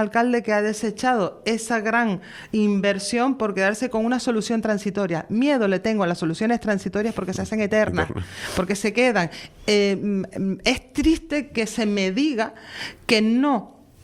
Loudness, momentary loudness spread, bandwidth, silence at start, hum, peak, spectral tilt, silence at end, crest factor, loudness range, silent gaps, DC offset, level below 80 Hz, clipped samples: -22 LUFS; 7 LU; 14.5 kHz; 0 s; none; -4 dBFS; -5 dB/octave; 0.35 s; 18 dB; 1 LU; none; under 0.1%; -46 dBFS; under 0.1%